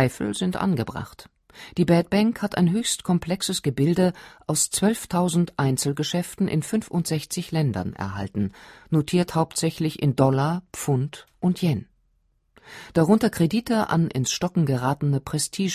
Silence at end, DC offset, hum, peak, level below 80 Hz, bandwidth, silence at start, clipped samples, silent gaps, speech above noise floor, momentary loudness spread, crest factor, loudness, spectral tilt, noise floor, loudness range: 0 s; under 0.1%; none; -4 dBFS; -52 dBFS; 15.5 kHz; 0 s; under 0.1%; none; 44 dB; 9 LU; 20 dB; -24 LUFS; -5.5 dB/octave; -67 dBFS; 3 LU